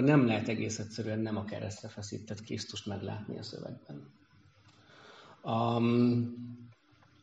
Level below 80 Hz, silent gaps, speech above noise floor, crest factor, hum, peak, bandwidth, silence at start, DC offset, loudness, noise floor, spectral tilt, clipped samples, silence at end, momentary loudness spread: -72 dBFS; none; 31 dB; 20 dB; none; -12 dBFS; 8 kHz; 0 s; under 0.1%; -33 LUFS; -64 dBFS; -6.5 dB/octave; under 0.1%; 0.5 s; 21 LU